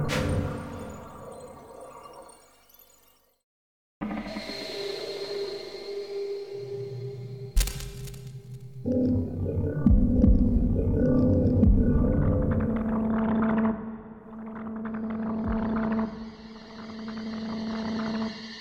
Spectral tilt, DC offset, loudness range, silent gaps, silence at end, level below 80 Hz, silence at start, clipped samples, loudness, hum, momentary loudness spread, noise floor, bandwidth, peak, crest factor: -7 dB/octave; under 0.1%; 15 LU; 3.44-4.01 s; 0 s; -34 dBFS; 0 s; under 0.1%; -28 LUFS; none; 20 LU; -62 dBFS; 19.5 kHz; -8 dBFS; 20 dB